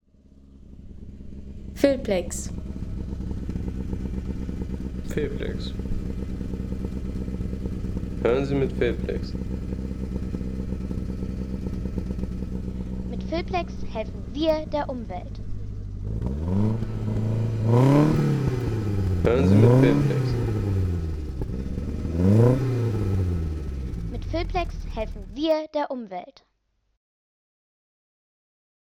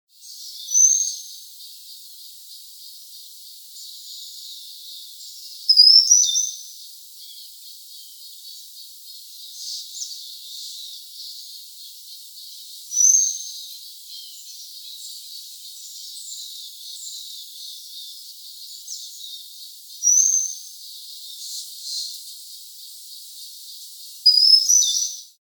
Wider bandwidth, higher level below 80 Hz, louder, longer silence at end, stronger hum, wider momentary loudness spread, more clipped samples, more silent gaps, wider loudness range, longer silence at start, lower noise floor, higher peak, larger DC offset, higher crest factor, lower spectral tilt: second, 14 kHz vs 19.5 kHz; first, -34 dBFS vs under -90 dBFS; second, -26 LUFS vs -15 LUFS; first, 2.55 s vs 0.2 s; neither; second, 14 LU vs 24 LU; neither; neither; second, 10 LU vs 18 LU; first, 0.45 s vs 0.25 s; first, -71 dBFS vs -42 dBFS; about the same, -4 dBFS vs -2 dBFS; neither; about the same, 20 dB vs 24 dB; first, -8 dB/octave vs 14 dB/octave